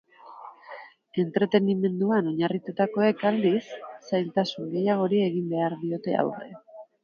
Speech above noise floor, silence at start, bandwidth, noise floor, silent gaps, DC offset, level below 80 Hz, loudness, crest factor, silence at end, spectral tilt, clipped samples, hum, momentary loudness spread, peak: 21 dB; 0.25 s; 6.8 kHz; -46 dBFS; none; under 0.1%; -74 dBFS; -26 LUFS; 20 dB; 0.2 s; -8 dB/octave; under 0.1%; none; 20 LU; -8 dBFS